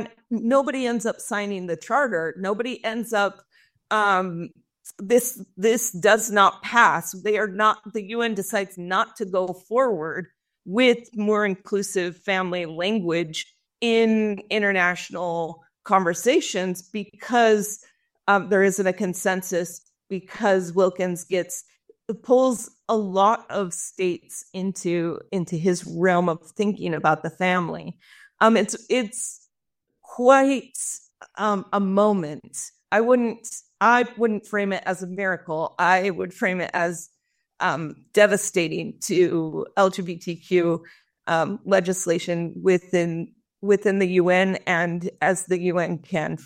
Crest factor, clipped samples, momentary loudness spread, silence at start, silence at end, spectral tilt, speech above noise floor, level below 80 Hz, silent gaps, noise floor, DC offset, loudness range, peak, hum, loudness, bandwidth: 20 dB; under 0.1%; 12 LU; 0 s; 0 s; -4.5 dB/octave; 57 dB; -70 dBFS; none; -80 dBFS; under 0.1%; 4 LU; -2 dBFS; none; -23 LUFS; 16 kHz